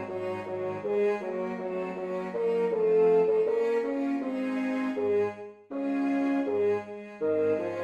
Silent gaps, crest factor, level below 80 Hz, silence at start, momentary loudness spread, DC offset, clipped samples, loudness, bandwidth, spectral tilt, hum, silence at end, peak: none; 12 dB; -72 dBFS; 0 s; 10 LU; under 0.1%; under 0.1%; -28 LUFS; 8.2 kHz; -7.5 dB/octave; none; 0 s; -16 dBFS